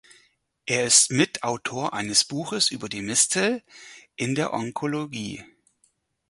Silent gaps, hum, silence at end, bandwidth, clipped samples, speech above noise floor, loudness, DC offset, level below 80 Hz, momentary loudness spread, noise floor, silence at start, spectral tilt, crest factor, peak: none; none; 0.85 s; 11.5 kHz; under 0.1%; 43 dB; -23 LUFS; under 0.1%; -64 dBFS; 16 LU; -68 dBFS; 0.65 s; -2 dB/octave; 24 dB; -2 dBFS